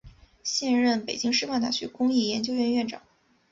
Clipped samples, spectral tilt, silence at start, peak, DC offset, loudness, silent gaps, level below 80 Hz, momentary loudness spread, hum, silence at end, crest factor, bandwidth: under 0.1%; -3 dB/octave; 0.05 s; -12 dBFS; under 0.1%; -26 LUFS; none; -62 dBFS; 7 LU; none; 0.5 s; 16 dB; 7.8 kHz